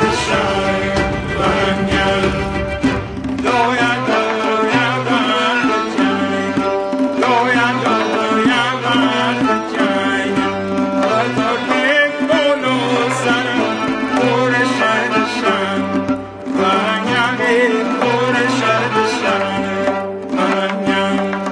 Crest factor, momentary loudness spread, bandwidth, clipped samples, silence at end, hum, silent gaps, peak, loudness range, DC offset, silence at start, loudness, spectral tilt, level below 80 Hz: 14 dB; 4 LU; 10.5 kHz; under 0.1%; 0 s; none; none; -2 dBFS; 1 LU; under 0.1%; 0 s; -16 LUFS; -5 dB/octave; -38 dBFS